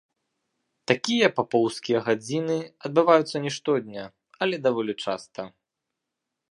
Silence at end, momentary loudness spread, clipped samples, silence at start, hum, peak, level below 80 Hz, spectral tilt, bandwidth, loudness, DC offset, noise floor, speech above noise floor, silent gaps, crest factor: 1.05 s; 18 LU; under 0.1%; 0.9 s; none; -2 dBFS; -74 dBFS; -5 dB/octave; 11.5 kHz; -25 LUFS; under 0.1%; -84 dBFS; 60 dB; none; 24 dB